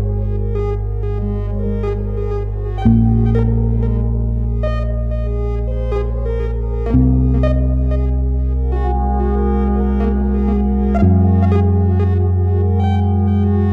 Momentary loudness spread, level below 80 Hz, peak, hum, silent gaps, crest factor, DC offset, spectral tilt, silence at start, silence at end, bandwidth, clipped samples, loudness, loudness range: 7 LU; -20 dBFS; 0 dBFS; none; none; 14 dB; under 0.1%; -11 dB/octave; 0 s; 0 s; 4.1 kHz; under 0.1%; -17 LUFS; 4 LU